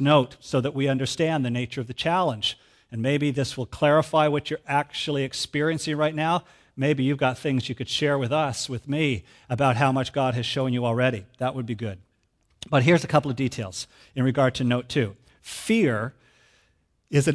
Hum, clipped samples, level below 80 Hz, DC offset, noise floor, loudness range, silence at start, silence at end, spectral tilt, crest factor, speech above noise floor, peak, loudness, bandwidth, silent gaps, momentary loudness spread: none; under 0.1%; -58 dBFS; under 0.1%; -68 dBFS; 2 LU; 0 s; 0 s; -5.5 dB/octave; 20 dB; 44 dB; -4 dBFS; -25 LUFS; 11 kHz; none; 11 LU